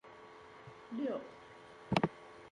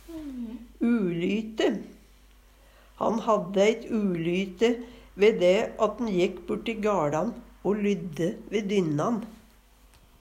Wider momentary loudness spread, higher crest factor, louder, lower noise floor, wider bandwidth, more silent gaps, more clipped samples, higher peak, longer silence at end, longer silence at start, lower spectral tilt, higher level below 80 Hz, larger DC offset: first, 20 LU vs 12 LU; first, 26 dB vs 18 dB; second, -38 LUFS vs -27 LUFS; about the same, -56 dBFS vs -56 dBFS; second, 11 kHz vs 15.5 kHz; neither; neither; second, -16 dBFS vs -10 dBFS; second, 0 s vs 0.85 s; about the same, 0.05 s vs 0.05 s; about the same, -6.5 dB/octave vs -6 dB/octave; second, -68 dBFS vs -56 dBFS; neither